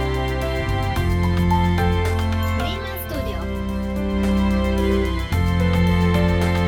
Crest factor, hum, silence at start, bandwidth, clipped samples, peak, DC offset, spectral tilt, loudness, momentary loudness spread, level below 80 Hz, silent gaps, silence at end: 14 dB; none; 0 s; 17.5 kHz; under 0.1%; -6 dBFS; under 0.1%; -7 dB/octave; -21 LUFS; 8 LU; -28 dBFS; none; 0 s